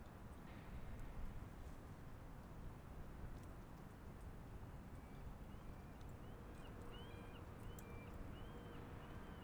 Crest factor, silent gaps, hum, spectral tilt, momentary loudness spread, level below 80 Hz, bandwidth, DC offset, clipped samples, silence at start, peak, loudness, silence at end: 14 dB; none; none; -6.5 dB/octave; 3 LU; -58 dBFS; over 20 kHz; under 0.1%; under 0.1%; 0 s; -38 dBFS; -57 LUFS; 0 s